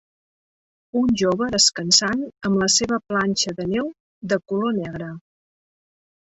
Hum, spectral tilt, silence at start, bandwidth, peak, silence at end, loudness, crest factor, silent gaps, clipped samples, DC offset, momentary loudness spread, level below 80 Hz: none; -3 dB/octave; 0.95 s; 8.2 kHz; -2 dBFS; 1.15 s; -20 LUFS; 20 dB; 4.00-4.21 s; under 0.1%; under 0.1%; 13 LU; -54 dBFS